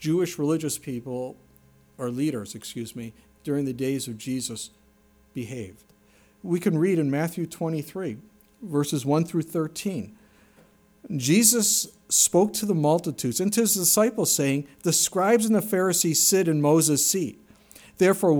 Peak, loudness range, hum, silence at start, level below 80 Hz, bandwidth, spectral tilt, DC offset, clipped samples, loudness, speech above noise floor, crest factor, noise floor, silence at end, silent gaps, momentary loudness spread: -6 dBFS; 11 LU; none; 0 s; -64 dBFS; over 20 kHz; -4 dB/octave; under 0.1%; under 0.1%; -23 LUFS; 35 dB; 20 dB; -59 dBFS; 0 s; none; 17 LU